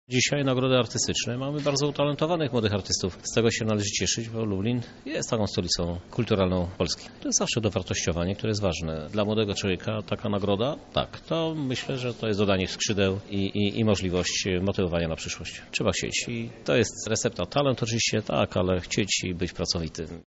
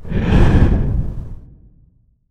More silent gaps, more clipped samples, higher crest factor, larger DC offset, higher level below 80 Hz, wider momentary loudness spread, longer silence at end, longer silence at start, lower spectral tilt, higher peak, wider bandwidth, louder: neither; neither; about the same, 18 dB vs 16 dB; neither; second, -48 dBFS vs -18 dBFS; second, 6 LU vs 18 LU; second, 0.05 s vs 0.9 s; about the same, 0.1 s vs 0 s; second, -4.5 dB/octave vs -8.5 dB/octave; second, -8 dBFS vs 0 dBFS; about the same, 8 kHz vs 8.4 kHz; second, -27 LUFS vs -16 LUFS